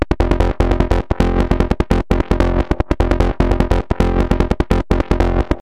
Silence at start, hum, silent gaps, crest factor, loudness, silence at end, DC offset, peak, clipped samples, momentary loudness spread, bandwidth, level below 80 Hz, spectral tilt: 0 s; none; none; 14 dB; -17 LUFS; 0 s; under 0.1%; 0 dBFS; under 0.1%; 2 LU; 9.4 kHz; -18 dBFS; -7.5 dB/octave